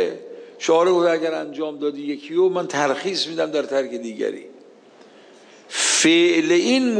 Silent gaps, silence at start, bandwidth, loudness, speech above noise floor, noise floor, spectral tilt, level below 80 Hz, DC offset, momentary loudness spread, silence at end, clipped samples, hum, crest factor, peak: none; 0 s; 10.5 kHz; -20 LUFS; 28 dB; -48 dBFS; -2.5 dB/octave; -76 dBFS; under 0.1%; 13 LU; 0 s; under 0.1%; none; 16 dB; -6 dBFS